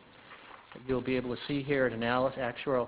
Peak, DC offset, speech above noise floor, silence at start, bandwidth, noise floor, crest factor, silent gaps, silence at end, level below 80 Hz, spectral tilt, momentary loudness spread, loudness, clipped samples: -14 dBFS; under 0.1%; 22 dB; 0.2 s; 4 kHz; -53 dBFS; 18 dB; none; 0 s; -58 dBFS; -4.5 dB/octave; 21 LU; -32 LUFS; under 0.1%